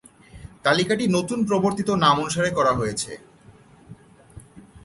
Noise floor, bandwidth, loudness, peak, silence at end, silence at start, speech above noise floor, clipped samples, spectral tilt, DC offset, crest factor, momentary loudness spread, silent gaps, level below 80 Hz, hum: -51 dBFS; 11.5 kHz; -22 LUFS; -4 dBFS; 0.05 s; 0.35 s; 29 dB; under 0.1%; -4.5 dB/octave; under 0.1%; 20 dB; 9 LU; none; -52 dBFS; none